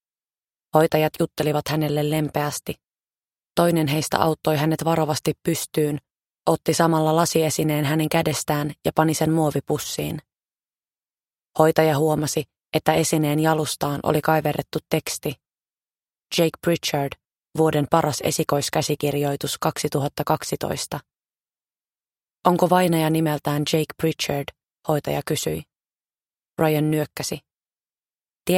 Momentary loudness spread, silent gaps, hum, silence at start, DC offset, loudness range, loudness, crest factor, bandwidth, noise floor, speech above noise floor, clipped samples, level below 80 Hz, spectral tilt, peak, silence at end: 10 LU; 28.36-28.40 s; none; 0.75 s; under 0.1%; 5 LU; -22 LUFS; 22 dB; 16.5 kHz; under -90 dBFS; over 69 dB; under 0.1%; -54 dBFS; -5 dB/octave; 0 dBFS; 0 s